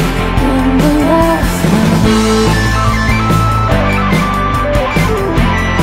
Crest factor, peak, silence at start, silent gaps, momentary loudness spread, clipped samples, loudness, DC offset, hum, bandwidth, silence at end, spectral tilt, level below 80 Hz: 10 dB; 0 dBFS; 0 s; none; 3 LU; under 0.1%; -11 LUFS; under 0.1%; none; 16.5 kHz; 0 s; -6 dB/octave; -18 dBFS